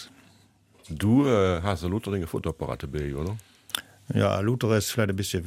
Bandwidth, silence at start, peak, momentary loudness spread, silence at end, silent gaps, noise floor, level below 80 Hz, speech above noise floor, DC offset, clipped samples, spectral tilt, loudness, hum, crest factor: 16 kHz; 0 s; -8 dBFS; 11 LU; 0 s; none; -59 dBFS; -46 dBFS; 34 dB; under 0.1%; under 0.1%; -6 dB/octave; -26 LUFS; none; 18 dB